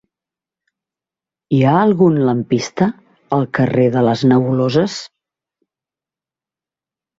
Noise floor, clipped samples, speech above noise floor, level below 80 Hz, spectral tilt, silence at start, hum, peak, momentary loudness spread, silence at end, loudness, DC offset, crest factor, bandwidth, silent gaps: -89 dBFS; under 0.1%; 75 dB; -54 dBFS; -7 dB/octave; 1.5 s; none; -2 dBFS; 7 LU; 2.1 s; -15 LUFS; under 0.1%; 16 dB; 7.8 kHz; none